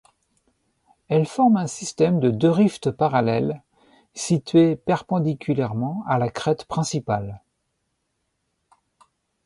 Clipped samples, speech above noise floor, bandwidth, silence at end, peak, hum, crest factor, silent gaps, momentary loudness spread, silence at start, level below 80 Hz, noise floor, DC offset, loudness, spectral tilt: under 0.1%; 54 dB; 11.5 kHz; 2.1 s; -6 dBFS; none; 18 dB; none; 9 LU; 1.1 s; -58 dBFS; -75 dBFS; under 0.1%; -22 LUFS; -6.5 dB/octave